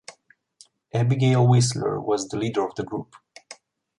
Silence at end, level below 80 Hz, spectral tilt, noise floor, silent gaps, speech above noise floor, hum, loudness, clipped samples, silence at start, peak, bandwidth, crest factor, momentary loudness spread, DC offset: 0.45 s; -60 dBFS; -6 dB/octave; -58 dBFS; none; 36 dB; none; -23 LUFS; under 0.1%; 0.1 s; -8 dBFS; 11.5 kHz; 16 dB; 20 LU; under 0.1%